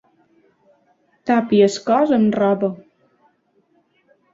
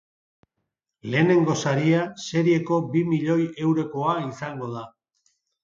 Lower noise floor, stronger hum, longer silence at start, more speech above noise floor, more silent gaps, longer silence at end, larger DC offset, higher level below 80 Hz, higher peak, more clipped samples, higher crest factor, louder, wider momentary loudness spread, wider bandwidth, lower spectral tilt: second, -62 dBFS vs -80 dBFS; neither; first, 1.25 s vs 1.05 s; second, 46 dB vs 58 dB; neither; first, 1.55 s vs 0.75 s; neither; about the same, -64 dBFS vs -68 dBFS; about the same, -4 dBFS vs -6 dBFS; neither; about the same, 18 dB vs 18 dB; first, -17 LUFS vs -23 LUFS; about the same, 11 LU vs 13 LU; about the same, 7.8 kHz vs 7.6 kHz; about the same, -6 dB/octave vs -6.5 dB/octave